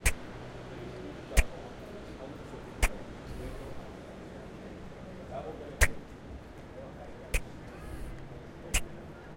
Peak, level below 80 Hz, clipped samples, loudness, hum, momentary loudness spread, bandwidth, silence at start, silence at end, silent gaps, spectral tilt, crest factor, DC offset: -8 dBFS; -38 dBFS; under 0.1%; -38 LUFS; none; 15 LU; 16 kHz; 0 s; 0 s; none; -3.5 dB/octave; 28 dB; under 0.1%